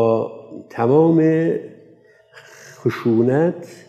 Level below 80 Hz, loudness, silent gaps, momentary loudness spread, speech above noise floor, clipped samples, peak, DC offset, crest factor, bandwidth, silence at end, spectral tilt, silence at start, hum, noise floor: -72 dBFS; -18 LUFS; none; 14 LU; 33 dB; under 0.1%; -4 dBFS; under 0.1%; 16 dB; 8.4 kHz; 0.15 s; -9 dB/octave; 0 s; none; -50 dBFS